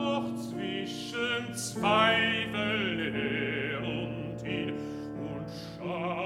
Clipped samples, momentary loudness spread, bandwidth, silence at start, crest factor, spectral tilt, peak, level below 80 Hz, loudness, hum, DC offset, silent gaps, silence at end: under 0.1%; 13 LU; 15.5 kHz; 0 s; 20 dB; -4.5 dB/octave; -10 dBFS; -60 dBFS; -31 LUFS; none; under 0.1%; none; 0 s